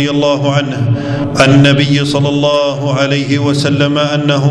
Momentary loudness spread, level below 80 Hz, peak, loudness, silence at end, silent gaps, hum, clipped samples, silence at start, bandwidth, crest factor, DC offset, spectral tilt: 7 LU; -42 dBFS; 0 dBFS; -11 LUFS; 0 s; none; none; 0.2%; 0 s; 11 kHz; 10 dB; under 0.1%; -6 dB/octave